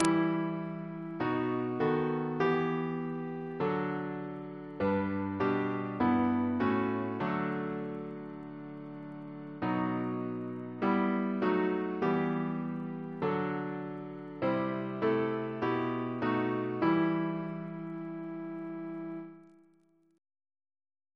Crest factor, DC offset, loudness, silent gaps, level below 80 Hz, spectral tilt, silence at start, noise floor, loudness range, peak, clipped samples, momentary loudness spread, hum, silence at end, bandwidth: 26 dB; under 0.1%; -33 LUFS; none; -70 dBFS; -7.5 dB/octave; 0 s; -68 dBFS; 5 LU; -8 dBFS; under 0.1%; 12 LU; none; 1.65 s; 11 kHz